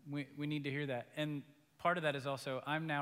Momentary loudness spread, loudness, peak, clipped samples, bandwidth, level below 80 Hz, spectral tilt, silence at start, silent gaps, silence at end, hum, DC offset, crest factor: 6 LU; -40 LUFS; -20 dBFS; under 0.1%; 16 kHz; -82 dBFS; -6 dB/octave; 0.05 s; none; 0 s; none; under 0.1%; 20 dB